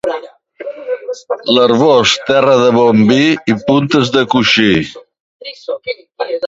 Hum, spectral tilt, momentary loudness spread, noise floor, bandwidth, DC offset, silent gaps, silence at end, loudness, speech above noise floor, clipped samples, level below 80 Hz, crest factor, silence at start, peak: none; -5 dB/octave; 17 LU; -31 dBFS; 7.8 kHz; under 0.1%; 5.20-5.40 s; 0 s; -11 LUFS; 20 dB; under 0.1%; -48 dBFS; 12 dB; 0.05 s; 0 dBFS